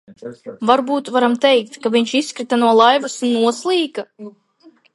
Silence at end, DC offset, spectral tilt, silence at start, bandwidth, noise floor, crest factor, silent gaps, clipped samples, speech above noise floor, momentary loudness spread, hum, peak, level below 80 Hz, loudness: 0.65 s; under 0.1%; -3.5 dB/octave; 0.1 s; 11.5 kHz; -51 dBFS; 18 dB; none; under 0.1%; 34 dB; 17 LU; none; 0 dBFS; -70 dBFS; -16 LUFS